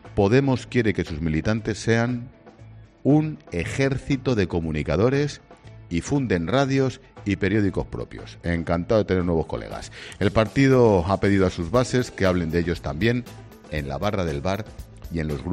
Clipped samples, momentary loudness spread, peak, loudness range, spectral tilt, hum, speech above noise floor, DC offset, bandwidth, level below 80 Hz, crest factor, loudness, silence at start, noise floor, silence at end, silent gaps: under 0.1%; 13 LU; -6 dBFS; 4 LU; -7 dB/octave; none; 23 dB; under 0.1%; 14 kHz; -42 dBFS; 18 dB; -23 LUFS; 0.05 s; -46 dBFS; 0 s; none